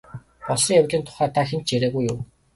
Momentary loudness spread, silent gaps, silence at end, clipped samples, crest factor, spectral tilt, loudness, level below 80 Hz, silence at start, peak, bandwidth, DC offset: 10 LU; none; 0.3 s; under 0.1%; 18 dB; -4.5 dB/octave; -21 LUFS; -54 dBFS; 0.15 s; -6 dBFS; 11.5 kHz; under 0.1%